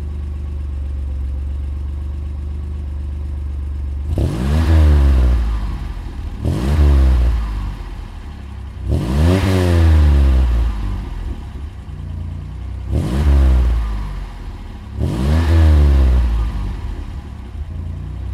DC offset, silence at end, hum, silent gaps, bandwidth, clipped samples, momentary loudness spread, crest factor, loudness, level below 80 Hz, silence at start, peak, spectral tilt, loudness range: under 0.1%; 0 s; none; none; 11 kHz; under 0.1%; 18 LU; 14 dB; -18 LUFS; -18 dBFS; 0 s; -2 dBFS; -7.5 dB/octave; 7 LU